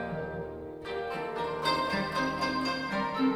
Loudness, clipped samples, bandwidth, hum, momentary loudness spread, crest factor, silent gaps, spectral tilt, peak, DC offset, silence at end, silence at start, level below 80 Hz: -32 LUFS; under 0.1%; 14.5 kHz; none; 9 LU; 16 dB; none; -5 dB/octave; -14 dBFS; under 0.1%; 0 s; 0 s; -56 dBFS